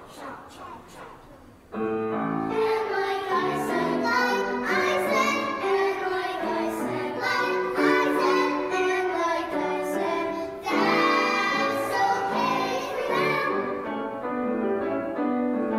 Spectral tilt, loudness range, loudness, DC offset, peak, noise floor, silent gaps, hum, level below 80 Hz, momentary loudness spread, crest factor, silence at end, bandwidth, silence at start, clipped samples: -4.5 dB/octave; 3 LU; -25 LUFS; under 0.1%; -10 dBFS; -49 dBFS; none; none; -62 dBFS; 9 LU; 16 dB; 0 s; 16 kHz; 0 s; under 0.1%